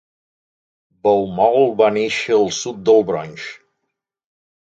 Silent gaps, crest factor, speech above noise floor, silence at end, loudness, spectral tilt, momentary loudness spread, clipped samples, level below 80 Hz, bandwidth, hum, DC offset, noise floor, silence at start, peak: none; 18 dB; 61 dB; 1.2 s; -17 LUFS; -4.5 dB/octave; 12 LU; under 0.1%; -60 dBFS; 7.8 kHz; none; under 0.1%; -77 dBFS; 1.05 s; 0 dBFS